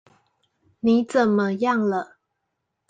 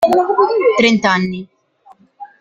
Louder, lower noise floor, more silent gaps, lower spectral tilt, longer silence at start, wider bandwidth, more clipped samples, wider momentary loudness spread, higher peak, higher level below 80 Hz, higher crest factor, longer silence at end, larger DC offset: second, -22 LUFS vs -13 LUFS; first, -78 dBFS vs -49 dBFS; neither; first, -7 dB/octave vs -5 dB/octave; first, 0.85 s vs 0 s; second, 9 kHz vs 15.5 kHz; neither; about the same, 8 LU vs 9 LU; second, -6 dBFS vs 0 dBFS; second, -66 dBFS vs -56 dBFS; about the same, 18 dB vs 14 dB; first, 0.85 s vs 0.15 s; neither